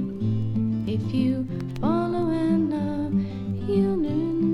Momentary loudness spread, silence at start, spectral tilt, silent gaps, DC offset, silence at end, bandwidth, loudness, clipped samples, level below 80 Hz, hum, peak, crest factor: 5 LU; 0 s; -9.5 dB/octave; none; under 0.1%; 0 s; 10.5 kHz; -25 LUFS; under 0.1%; -46 dBFS; none; -12 dBFS; 12 dB